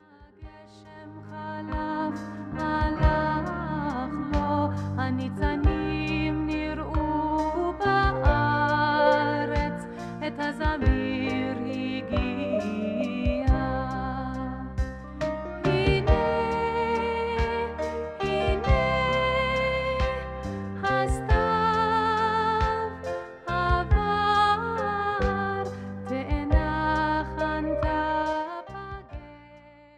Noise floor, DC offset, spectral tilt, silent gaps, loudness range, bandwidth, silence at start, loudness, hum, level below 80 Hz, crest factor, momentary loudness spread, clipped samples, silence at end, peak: -51 dBFS; under 0.1%; -7 dB/octave; none; 4 LU; 10 kHz; 0.2 s; -26 LUFS; none; -34 dBFS; 18 dB; 11 LU; under 0.1%; 0.3 s; -8 dBFS